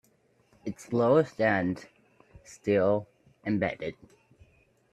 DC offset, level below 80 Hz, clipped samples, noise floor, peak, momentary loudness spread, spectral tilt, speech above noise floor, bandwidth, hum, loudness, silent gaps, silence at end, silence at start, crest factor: under 0.1%; -66 dBFS; under 0.1%; -67 dBFS; -10 dBFS; 16 LU; -7 dB/octave; 40 dB; 12 kHz; none; -28 LUFS; none; 1 s; 0.65 s; 20 dB